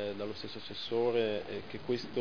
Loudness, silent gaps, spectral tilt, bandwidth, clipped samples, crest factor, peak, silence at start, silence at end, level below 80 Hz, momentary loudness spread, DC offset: -35 LUFS; none; -3.5 dB/octave; 5.4 kHz; under 0.1%; 16 dB; -18 dBFS; 0 s; 0 s; -68 dBFS; 11 LU; 0.4%